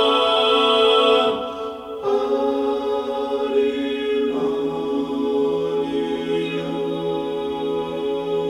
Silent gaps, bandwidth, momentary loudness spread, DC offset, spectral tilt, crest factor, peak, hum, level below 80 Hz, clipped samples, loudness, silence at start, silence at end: none; 11.5 kHz; 9 LU; under 0.1%; -5 dB/octave; 16 dB; -4 dBFS; none; -56 dBFS; under 0.1%; -21 LUFS; 0 s; 0 s